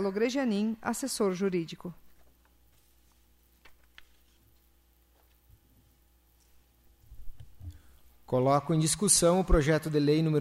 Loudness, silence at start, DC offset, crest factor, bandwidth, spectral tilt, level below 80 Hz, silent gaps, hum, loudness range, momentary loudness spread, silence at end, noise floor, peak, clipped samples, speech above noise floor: -27 LUFS; 0 s; under 0.1%; 20 dB; 15.5 kHz; -4.5 dB/octave; -44 dBFS; none; none; 15 LU; 22 LU; 0 s; -65 dBFS; -10 dBFS; under 0.1%; 38 dB